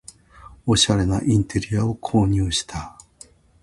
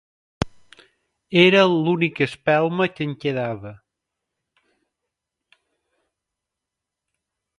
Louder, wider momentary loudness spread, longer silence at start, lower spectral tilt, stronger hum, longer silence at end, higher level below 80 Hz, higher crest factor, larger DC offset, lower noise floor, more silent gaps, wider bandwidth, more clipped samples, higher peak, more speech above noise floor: about the same, -20 LUFS vs -20 LUFS; about the same, 14 LU vs 16 LU; about the same, 0.45 s vs 0.4 s; second, -5 dB/octave vs -6.5 dB/octave; neither; second, 0.75 s vs 3.85 s; first, -38 dBFS vs -52 dBFS; about the same, 20 dB vs 24 dB; neither; second, -50 dBFS vs -85 dBFS; neither; about the same, 11.5 kHz vs 11.5 kHz; neither; about the same, -2 dBFS vs 0 dBFS; second, 30 dB vs 65 dB